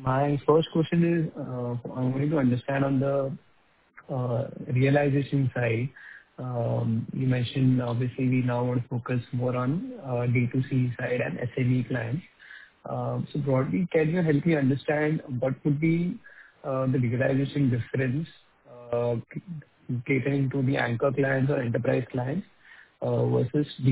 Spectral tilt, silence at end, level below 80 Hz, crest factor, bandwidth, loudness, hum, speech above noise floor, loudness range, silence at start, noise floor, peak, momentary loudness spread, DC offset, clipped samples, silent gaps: -12 dB/octave; 0 s; -60 dBFS; 18 dB; 4 kHz; -27 LUFS; none; 38 dB; 3 LU; 0 s; -64 dBFS; -8 dBFS; 10 LU; under 0.1%; under 0.1%; none